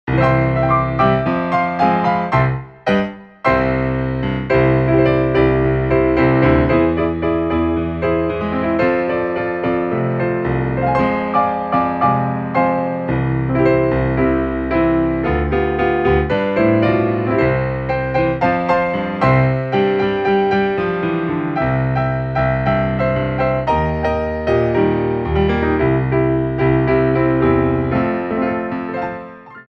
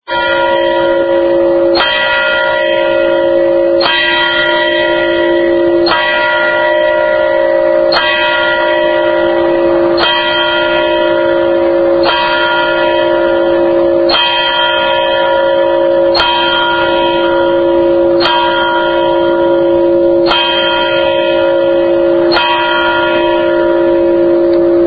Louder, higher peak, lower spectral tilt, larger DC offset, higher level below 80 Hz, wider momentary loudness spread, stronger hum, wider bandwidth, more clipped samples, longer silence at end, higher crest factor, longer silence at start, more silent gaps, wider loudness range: second, -17 LUFS vs -10 LUFS; about the same, -2 dBFS vs 0 dBFS; first, -9.5 dB/octave vs -6.5 dB/octave; neither; first, -32 dBFS vs -40 dBFS; first, 5 LU vs 2 LU; neither; first, 5.8 kHz vs 5 kHz; neither; about the same, 0.1 s vs 0 s; about the same, 14 dB vs 10 dB; about the same, 0.05 s vs 0.1 s; neither; about the same, 3 LU vs 1 LU